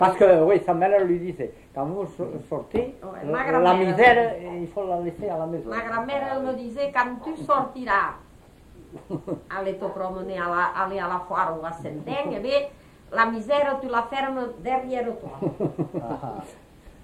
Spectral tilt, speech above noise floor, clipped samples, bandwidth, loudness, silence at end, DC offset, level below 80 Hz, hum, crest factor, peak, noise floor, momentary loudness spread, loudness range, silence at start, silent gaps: -6.5 dB/octave; 26 dB; under 0.1%; 12 kHz; -24 LUFS; 0.15 s; under 0.1%; -52 dBFS; none; 22 dB; -2 dBFS; -50 dBFS; 14 LU; 6 LU; 0 s; none